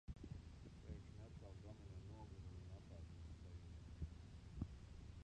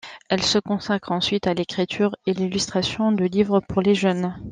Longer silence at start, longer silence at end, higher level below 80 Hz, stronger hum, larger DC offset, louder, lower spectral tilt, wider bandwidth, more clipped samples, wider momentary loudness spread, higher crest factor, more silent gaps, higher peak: about the same, 0.05 s vs 0.05 s; about the same, 0 s vs 0 s; second, -60 dBFS vs -52 dBFS; neither; neither; second, -58 LUFS vs -22 LUFS; first, -7 dB/octave vs -5 dB/octave; about the same, 9.6 kHz vs 9.8 kHz; neither; about the same, 5 LU vs 5 LU; first, 22 dB vs 16 dB; neither; second, -34 dBFS vs -6 dBFS